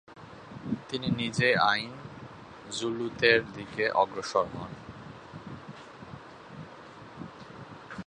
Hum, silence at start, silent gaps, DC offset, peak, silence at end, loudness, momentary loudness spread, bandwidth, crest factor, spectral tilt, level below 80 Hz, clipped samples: none; 0.1 s; none; under 0.1%; -6 dBFS; 0.05 s; -28 LUFS; 23 LU; 10.5 kHz; 26 dB; -4.5 dB/octave; -62 dBFS; under 0.1%